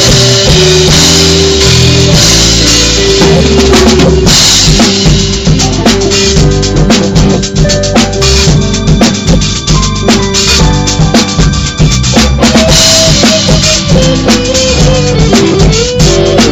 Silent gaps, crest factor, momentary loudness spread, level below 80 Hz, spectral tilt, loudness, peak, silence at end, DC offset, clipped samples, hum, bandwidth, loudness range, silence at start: none; 6 dB; 5 LU; -14 dBFS; -4 dB/octave; -5 LUFS; 0 dBFS; 0 s; under 0.1%; 3%; none; over 20 kHz; 3 LU; 0 s